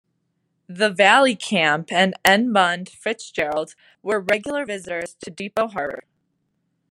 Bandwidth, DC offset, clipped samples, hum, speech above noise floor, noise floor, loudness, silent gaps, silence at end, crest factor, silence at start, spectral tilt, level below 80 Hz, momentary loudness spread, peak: 14 kHz; under 0.1%; under 0.1%; none; 51 dB; -72 dBFS; -20 LUFS; none; 0.9 s; 22 dB; 0.7 s; -3.5 dB/octave; -64 dBFS; 16 LU; 0 dBFS